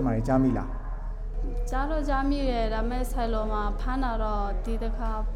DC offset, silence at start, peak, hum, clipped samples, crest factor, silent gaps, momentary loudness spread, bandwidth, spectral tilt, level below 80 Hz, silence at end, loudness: under 0.1%; 0 s; -12 dBFS; none; under 0.1%; 14 dB; none; 11 LU; 12.5 kHz; -7 dB/octave; -30 dBFS; 0 s; -29 LUFS